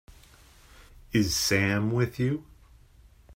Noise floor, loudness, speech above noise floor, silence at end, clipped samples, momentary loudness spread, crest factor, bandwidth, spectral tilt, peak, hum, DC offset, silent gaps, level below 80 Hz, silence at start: -56 dBFS; -26 LUFS; 30 dB; 0 s; under 0.1%; 6 LU; 20 dB; 16 kHz; -4.5 dB/octave; -10 dBFS; none; under 0.1%; none; -52 dBFS; 0.1 s